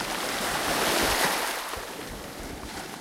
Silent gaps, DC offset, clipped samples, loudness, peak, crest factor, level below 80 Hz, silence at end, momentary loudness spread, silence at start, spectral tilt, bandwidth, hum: none; under 0.1%; under 0.1%; -27 LUFS; -10 dBFS; 18 dB; -48 dBFS; 0 s; 14 LU; 0 s; -2 dB/octave; 16 kHz; none